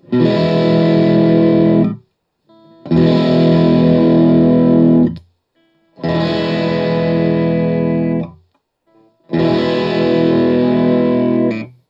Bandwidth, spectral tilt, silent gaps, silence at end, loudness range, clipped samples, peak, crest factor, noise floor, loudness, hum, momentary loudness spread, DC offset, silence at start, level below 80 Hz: 5.8 kHz; -9.5 dB/octave; none; 0.2 s; 5 LU; under 0.1%; 0 dBFS; 12 dB; -60 dBFS; -13 LUFS; none; 8 LU; under 0.1%; 0.1 s; -48 dBFS